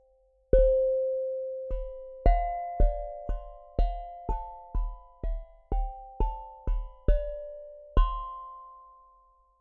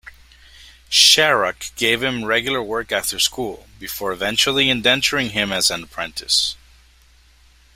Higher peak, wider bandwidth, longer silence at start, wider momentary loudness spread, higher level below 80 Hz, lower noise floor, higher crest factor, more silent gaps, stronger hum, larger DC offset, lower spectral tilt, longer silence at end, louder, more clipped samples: second, -8 dBFS vs 0 dBFS; second, 3.5 kHz vs 16 kHz; first, 0.55 s vs 0.05 s; about the same, 15 LU vs 15 LU; first, -30 dBFS vs -48 dBFS; first, -65 dBFS vs -52 dBFS; about the same, 22 dB vs 20 dB; neither; first, 50 Hz at -55 dBFS vs none; neither; first, -10 dB/octave vs -1.5 dB/octave; second, 0.8 s vs 1.2 s; second, -32 LUFS vs -17 LUFS; neither